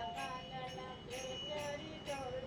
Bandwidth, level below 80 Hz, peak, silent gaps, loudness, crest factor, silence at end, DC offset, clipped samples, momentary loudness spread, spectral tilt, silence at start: 17 kHz; -62 dBFS; -30 dBFS; none; -44 LUFS; 14 dB; 0 s; under 0.1%; under 0.1%; 4 LU; -3.5 dB/octave; 0 s